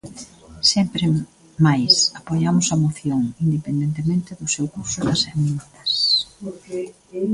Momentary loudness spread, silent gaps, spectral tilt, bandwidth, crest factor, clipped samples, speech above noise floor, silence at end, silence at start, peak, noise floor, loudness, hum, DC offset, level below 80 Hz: 15 LU; none; -4 dB/octave; 11.5 kHz; 20 dB; under 0.1%; 20 dB; 0 s; 0.05 s; -2 dBFS; -41 dBFS; -19 LUFS; none; under 0.1%; -52 dBFS